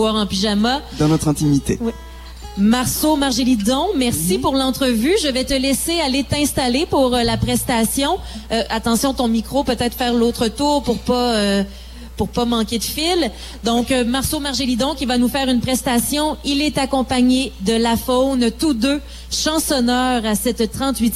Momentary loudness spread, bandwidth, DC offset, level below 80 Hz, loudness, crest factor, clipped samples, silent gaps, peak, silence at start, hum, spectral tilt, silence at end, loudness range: 4 LU; 16 kHz; under 0.1%; -34 dBFS; -18 LUFS; 12 dB; under 0.1%; none; -6 dBFS; 0 s; none; -4 dB/octave; 0 s; 2 LU